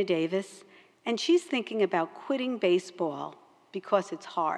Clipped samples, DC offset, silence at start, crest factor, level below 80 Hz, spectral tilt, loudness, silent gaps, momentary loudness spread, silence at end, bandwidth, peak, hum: under 0.1%; under 0.1%; 0 s; 18 dB; under -90 dBFS; -5 dB/octave; -29 LUFS; none; 14 LU; 0 s; 11 kHz; -12 dBFS; none